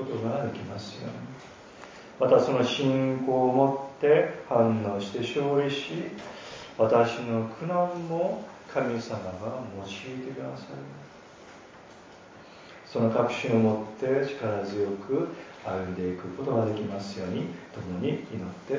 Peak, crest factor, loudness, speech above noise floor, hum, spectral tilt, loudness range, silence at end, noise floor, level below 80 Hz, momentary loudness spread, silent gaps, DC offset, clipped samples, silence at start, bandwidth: -8 dBFS; 20 dB; -28 LUFS; 22 dB; none; -6.5 dB/octave; 10 LU; 0 s; -49 dBFS; -62 dBFS; 22 LU; none; under 0.1%; under 0.1%; 0 s; 7.6 kHz